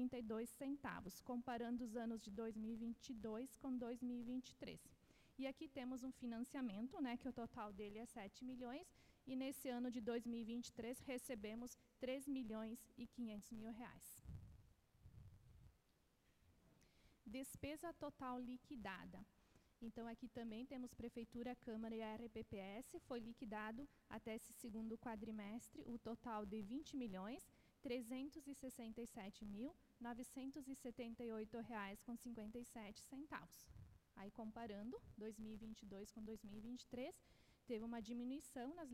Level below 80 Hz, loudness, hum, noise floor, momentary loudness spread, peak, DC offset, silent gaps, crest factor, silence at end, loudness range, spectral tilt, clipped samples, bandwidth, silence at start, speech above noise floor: -74 dBFS; -52 LUFS; none; -80 dBFS; 9 LU; -36 dBFS; under 0.1%; none; 16 dB; 0 s; 6 LU; -5 dB/octave; under 0.1%; 16 kHz; 0 s; 29 dB